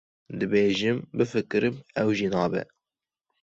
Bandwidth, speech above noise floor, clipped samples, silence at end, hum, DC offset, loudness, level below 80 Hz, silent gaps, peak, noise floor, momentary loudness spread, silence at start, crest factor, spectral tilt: 7.8 kHz; over 65 dB; under 0.1%; 0.8 s; none; under 0.1%; -26 LUFS; -60 dBFS; none; -10 dBFS; under -90 dBFS; 9 LU; 0.3 s; 16 dB; -6 dB/octave